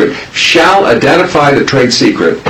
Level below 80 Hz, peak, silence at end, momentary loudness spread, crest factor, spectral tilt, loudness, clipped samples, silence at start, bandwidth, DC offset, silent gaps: -40 dBFS; 0 dBFS; 0 s; 3 LU; 8 dB; -4 dB/octave; -7 LUFS; 1%; 0 s; 16 kHz; under 0.1%; none